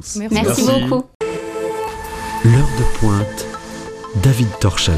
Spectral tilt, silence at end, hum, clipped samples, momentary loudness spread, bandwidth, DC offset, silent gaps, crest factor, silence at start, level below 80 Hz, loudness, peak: -5.5 dB/octave; 0 s; none; under 0.1%; 13 LU; 15.5 kHz; under 0.1%; 1.15-1.20 s; 16 dB; 0 s; -28 dBFS; -18 LUFS; -2 dBFS